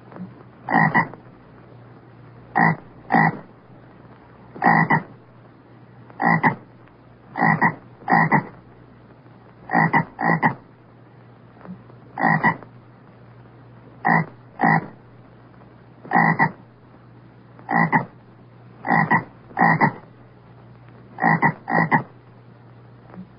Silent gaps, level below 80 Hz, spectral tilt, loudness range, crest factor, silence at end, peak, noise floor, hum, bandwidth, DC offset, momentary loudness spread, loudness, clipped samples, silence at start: none; -62 dBFS; -11.5 dB/octave; 3 LU; 20 dB; 0.15 s; -2 dBFS; -48 dBFS; none; 5.4 kHz; under 0.1%; 22 LU; -20 LUFS; under 0.1%; 0.15 s